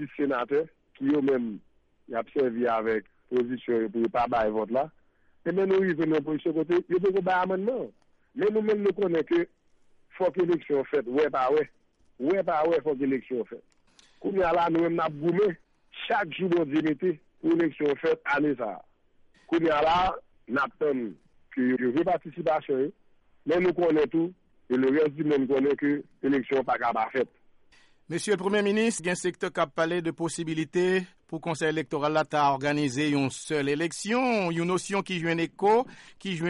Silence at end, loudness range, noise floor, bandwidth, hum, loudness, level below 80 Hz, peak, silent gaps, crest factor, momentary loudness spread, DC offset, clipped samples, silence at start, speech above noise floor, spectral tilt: 0 s; 2 LU; -61 dBFS; 11.5 kHz; none; -27 LUFS; -60 dBFS; -14 dBFS; none; 14 dB; 9 LU; under 0.1%; under 0.1%; 0 s; 35 dB; -5.5 dB/octave